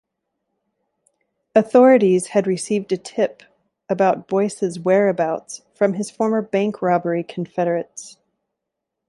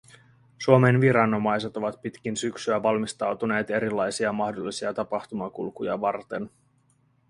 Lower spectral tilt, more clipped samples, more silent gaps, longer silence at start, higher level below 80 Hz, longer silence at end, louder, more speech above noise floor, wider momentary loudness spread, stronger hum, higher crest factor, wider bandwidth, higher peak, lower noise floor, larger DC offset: about the same, -6 dB/octave vs -6 dB/octave; neither; neither; first, 1.55 s vs 0.6 s; about the same, -68 dBFS vs -64 dBFS; first, 1 s vs 0.8 s; first, -19 LUFS vs -25 LUFS; first, 63 dB vs 40 dB; about the same, 12 LU vs 14 LU; neither; second, 18 dB vs 24 dB; about the same, 11.5 kHz vs 11.5 kHz; about the same, -2 dBFS vs -2 dBFS; first, -81 dBFS vs -65 dBFS; neither